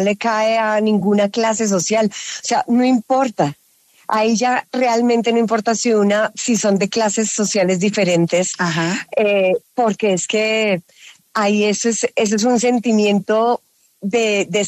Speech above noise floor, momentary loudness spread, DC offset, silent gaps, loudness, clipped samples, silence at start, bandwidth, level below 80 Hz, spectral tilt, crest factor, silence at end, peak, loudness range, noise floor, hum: 38 dB; 4 LU; under 0.1%; none; -17 LUFS; under 0.1%; 0 s; 13.5 kHz; -66 dBFS; -4 dB/octave; 12 dB; 0 s; -4 dBFS; 1 LU; -54 dBFS; none